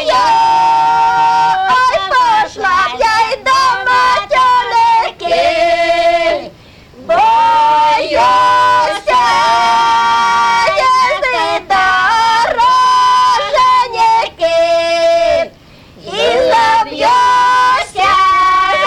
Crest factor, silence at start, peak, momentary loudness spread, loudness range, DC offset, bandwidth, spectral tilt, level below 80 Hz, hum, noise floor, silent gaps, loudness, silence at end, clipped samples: 8 dB; 0 s; -2 dBFS; 4 LU; 2 LU; under 0.1%; 12.5 kHz; -2 dB/octave; -42 dBFS; none; -39 dBFS; none; -10 LUFS; 0 s; under 0.1%